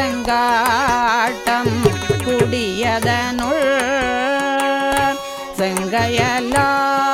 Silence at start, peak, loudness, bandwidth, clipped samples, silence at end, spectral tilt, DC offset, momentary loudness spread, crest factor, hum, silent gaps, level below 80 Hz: 0 s; 0 dBFS; -17 LUFS; over 20 kHz; under 0.1%; 0 s; -4 dB/octave; under 0.1%; 4 LU; 18 dB; none; none; -40 dBFS